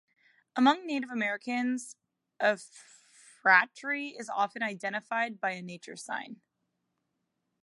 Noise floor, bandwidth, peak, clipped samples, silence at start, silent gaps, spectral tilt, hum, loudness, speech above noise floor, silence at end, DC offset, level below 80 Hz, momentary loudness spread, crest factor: -82 dBFS; 11.5 kHz; -8 dBFS; under 0.1%; 0.55 s; none; -3.5 dB/octave; none; -30 LUFS; 51 dB; 1.3 s; under 0.1%; -88 dBFS; 16 LU; 24 dB